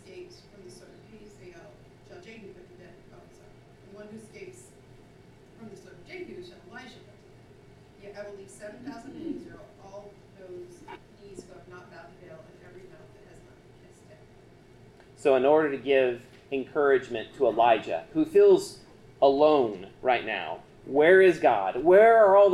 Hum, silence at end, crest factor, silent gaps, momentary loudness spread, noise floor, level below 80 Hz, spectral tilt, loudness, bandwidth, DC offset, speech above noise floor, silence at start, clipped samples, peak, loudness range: none; 0 s; 20 dB; none; 28 LU; -54 dBFS; -62 dBFS; -5.5 dB/octave; -23 LUFS; 12 kHz; under 0.1%; 32 dB; 0.15 s; under 0.1%; -8 dBFS; 25 LU